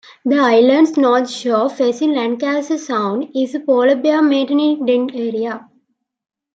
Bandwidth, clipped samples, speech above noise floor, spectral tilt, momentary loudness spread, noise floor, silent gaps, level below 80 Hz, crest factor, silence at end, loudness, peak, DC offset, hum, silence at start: 8 kHz; under 0.1%; 50 dB; -4.5 dB/octave; 9 LU; -65 dBFS; none; -70 dBFS; 14 dB; 0.95 s; -16 LUFS; -2 dBFS; under 0.1%; none; 0.25 s